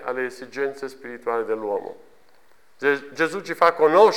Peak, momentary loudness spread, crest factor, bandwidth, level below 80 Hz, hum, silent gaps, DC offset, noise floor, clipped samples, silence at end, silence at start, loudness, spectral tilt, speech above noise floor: -4 dBFS; 15 LU; 20 dB; 14 kHz; -70 dBFS; none; none; 0.3%; -59 dBFS; under 0.1%; 0 s; 0 s; -23 LUFS; -4.5 dB/octave; 38 dB